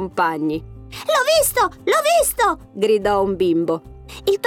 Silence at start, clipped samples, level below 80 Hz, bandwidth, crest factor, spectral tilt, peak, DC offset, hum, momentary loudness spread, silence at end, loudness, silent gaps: 0 s; under 0.1%; -44 dBFS; 19.5 kHz; 12 dB; -3 dB/octave; -6 dBFS; under 0.1%; none; 12 LU; 0 s; -18 LUFS; none